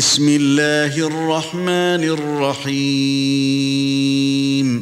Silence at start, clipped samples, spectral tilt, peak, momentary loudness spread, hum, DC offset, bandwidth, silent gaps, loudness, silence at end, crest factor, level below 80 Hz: 0 s; under 0.1%; -4 dB/octave; -4 dBFS; 6 LU; none; under 0.1%; 14.5 kHz; none; -17 LUFS; 0 s; 14 dB; -60 dBFS